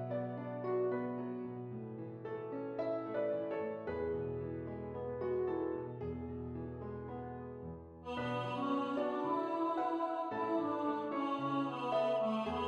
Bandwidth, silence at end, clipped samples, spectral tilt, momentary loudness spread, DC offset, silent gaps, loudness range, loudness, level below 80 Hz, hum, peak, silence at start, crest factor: 9.4 kHz; 0 s; under 0.1%; -8 dB/octave; 10 LU; under 0.1%; none; 5 LU; -39 LUFS; -68 dBFS; none; -24 dBFS; 0 s; 14 dB